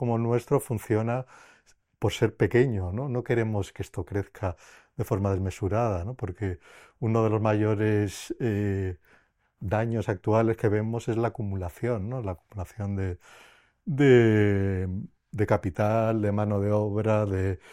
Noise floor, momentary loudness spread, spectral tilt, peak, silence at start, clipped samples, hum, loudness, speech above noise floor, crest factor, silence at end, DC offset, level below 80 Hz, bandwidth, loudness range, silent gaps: -64 dBFS; 12 LU; -7.5 dB/octave; -6 dBFS; 0 s; under 0.1%; none; -27 LUFS; 37 dB; 20 dB; 0 s; under 0.1%; -56 dBFS; 15 kHz; 6 LU; none